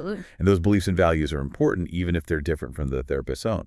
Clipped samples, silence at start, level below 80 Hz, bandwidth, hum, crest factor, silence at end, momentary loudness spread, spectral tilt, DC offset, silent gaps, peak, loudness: under 0.1%; 0 s; -38 dBFS; 12 kHz; none; 18 dB; 0 s; 8 LU; -7 dB/octave; under 0.1%; none; -6 dBFS; -24 LUFS